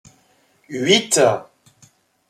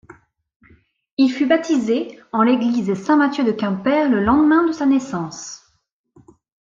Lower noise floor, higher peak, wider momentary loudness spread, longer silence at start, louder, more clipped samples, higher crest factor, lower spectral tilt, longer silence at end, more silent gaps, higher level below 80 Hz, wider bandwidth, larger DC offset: second, -59 dBFS vs -66 dBFS; about the same, -2 dBFS vs -4 dBFS; about the same, 14 LU vs 12 LU; first, 0.7 s vs 0.1 s; about the same, -17 LUFS vs -18 LUFS; neither; about the same, 20 dB vs 16 dB; second, -2.5 dB/octave vs -5.5 dB/octave; second, 0.85 s vs 1.15 s; second, none vs 0.56-0.60 s, 1.13-1.17 s; second, -66 dBFS vs -52 dBFS; first, 15.5 kHz vs 7.6 kHz; neither